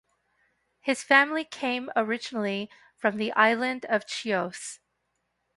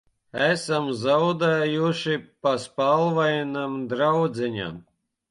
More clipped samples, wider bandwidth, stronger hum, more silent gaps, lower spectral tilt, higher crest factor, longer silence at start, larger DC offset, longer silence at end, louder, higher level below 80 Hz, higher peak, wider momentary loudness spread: neither; about the same, 11.5 kHz vs 11.5 kHz; first, 60 Hz at -70 dBFS vs none; neither; second, -3.5 dB/octave vs -5.5 dB/octave; first, 24 dB vs 14 dB; first, 0.85 s vs 0.35 s; neither; first, 0.8 s vs 0.5 s; about the same, -26 LUFS vs -24 LUFS; second, -76 dBFS vs -64 dBFS; first, -4 dBFS vs -10 dBFS; first, 14 LU vs 8 LU